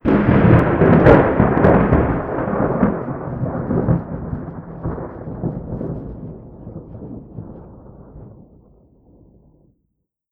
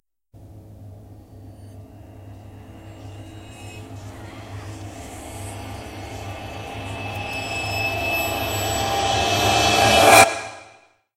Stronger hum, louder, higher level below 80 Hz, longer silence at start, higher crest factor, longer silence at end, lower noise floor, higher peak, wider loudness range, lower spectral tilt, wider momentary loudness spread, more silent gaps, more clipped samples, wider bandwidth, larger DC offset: neither; about the same, -17 LUFS vs -18 LUFS; first, -32 dBFS vs -42 dBFS; second, 0.05 s vs 0.35 s; second, 18 dB vs 24 dB; first, 2 s vs 0.45 s; first, -72 dBFS vs -52 dBFS; about the same, 0 dBFS vs 0 dBFS; about the same, 24 LU vs 24 LU; first, -11 dB/octave vs -3 dB/octave; second, 23 LU vs 28 LU; neither; neither; second, 5 kHz vs 16 kHz; neither